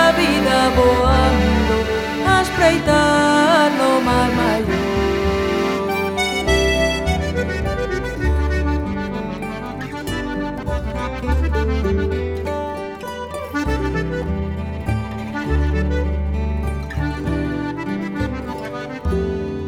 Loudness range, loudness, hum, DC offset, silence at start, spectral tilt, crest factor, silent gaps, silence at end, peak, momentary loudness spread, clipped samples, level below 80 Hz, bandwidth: 8 LU; -19 LUFS; none; under 0.1%; 0 s; -5.5 dB/octave; 18 dB; none; 0 s; 0 dBFS; 11 LU; under 0.1%; -26 dBFS; 16 kHz